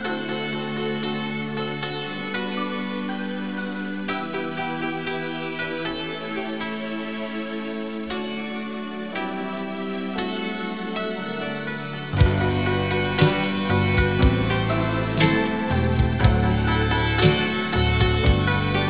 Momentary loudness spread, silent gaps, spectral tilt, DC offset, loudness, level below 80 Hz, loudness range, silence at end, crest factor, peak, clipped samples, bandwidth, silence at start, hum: 10 LU; none; -10.5 dB/octave; 0.5%; -24 LUFS; -32 dBFS; 8 LU; 0 s; 20 dB; -4 dBFS; under 0.1%; 4 kHz; 0 s; none